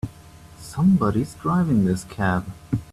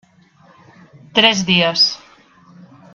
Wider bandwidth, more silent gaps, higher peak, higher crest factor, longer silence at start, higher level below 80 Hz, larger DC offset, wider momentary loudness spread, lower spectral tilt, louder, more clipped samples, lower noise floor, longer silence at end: first, 13 kHz vs 7.4 kHz; neither; second, -8 dBFS vs 0 dBFS; second, 14 dB vs 20 dB; second, 0.05 s vs 1.15 s; first, -46 dBFS vs -58 dBFS; neither; first, 14 LU vs 6 LU; first, -7.5 dB/octave vs -3 dB/octave; second, -22 LUFS vs -13 LUFS; neither; second, -45 dBFS vs -50 dBFS; second, 0.1 s vs 1 s